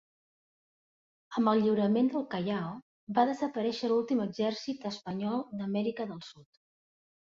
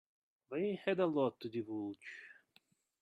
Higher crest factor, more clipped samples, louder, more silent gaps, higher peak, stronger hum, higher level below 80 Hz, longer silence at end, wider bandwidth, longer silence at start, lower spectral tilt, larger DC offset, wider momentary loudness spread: about the same, 20 dB vs 20 dB; neither; first, -31 LUFS vs -38 LUFS; first, 2.82-3.07 s vs none; first, -12 dBFS vs -20 dBFS; neither; first, -76 dBFS vs -86 dBFS; first, 0.95 s vs 0.7 s; second, 7.6 kHz vs 9 kHz; first, 1.3 s vs 0.5 s; about the same, -7 dB/octave vs -7.5 dB/octave; neither; second, 12 LU vs 17 LU